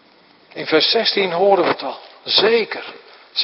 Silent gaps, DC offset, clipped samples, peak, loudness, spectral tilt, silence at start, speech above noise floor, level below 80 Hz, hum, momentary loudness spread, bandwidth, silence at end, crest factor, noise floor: none; under 0.1%; under 0.1%; 0 dBFS; -16 LUFS; -6.5 dB/octave; 0.55 s; 34 dB; -70 dBFS; none; 16 LU; 5.8 kHz; 0 s; 18 dB; -51 dBFS